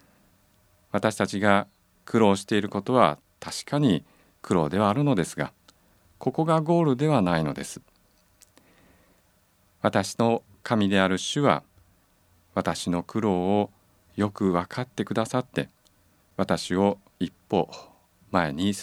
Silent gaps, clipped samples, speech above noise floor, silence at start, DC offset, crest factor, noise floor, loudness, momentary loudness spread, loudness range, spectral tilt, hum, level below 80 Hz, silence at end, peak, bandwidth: none; under 0.1%; 40 dB; 0.95 s; under 0.1%; 24 dB; -64 dBFS; -25 LUFS; 12 LU; 4 LU; -6 dB/octave; none; -60 dBFS; 0 s; -2 dBFS; 15 kHz